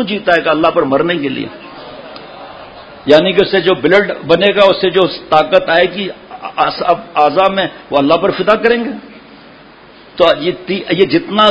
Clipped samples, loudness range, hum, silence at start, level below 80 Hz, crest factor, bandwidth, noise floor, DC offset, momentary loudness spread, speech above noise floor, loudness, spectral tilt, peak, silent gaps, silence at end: 0.3%; 4 LU; none; 0 s; -48 dBFS; 12 dB; 8 kHz; -39 dBFS; under 0.1%; 21 LU; 27 dB; -12 LUFS; -6.5 dB/octave; 0 dBFS; none; 0 s